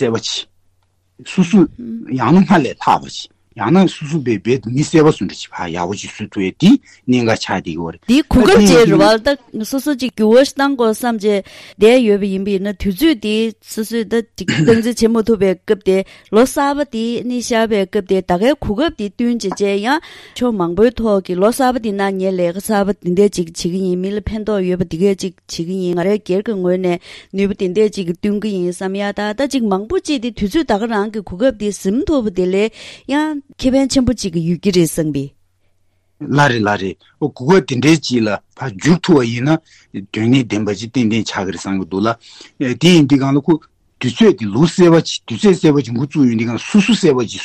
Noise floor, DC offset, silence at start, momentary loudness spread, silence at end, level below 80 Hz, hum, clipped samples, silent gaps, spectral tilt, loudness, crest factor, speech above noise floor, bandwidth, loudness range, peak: -60 dBFS; under 0.1%; 0 s; 10 LU; 0 s; -40 dBFS; none; under 0.1%; none; -6 dB/octave; -15 LUFS; 14 dB; 45 dB; 14.5 kHz; 5 LU; 0 dBFS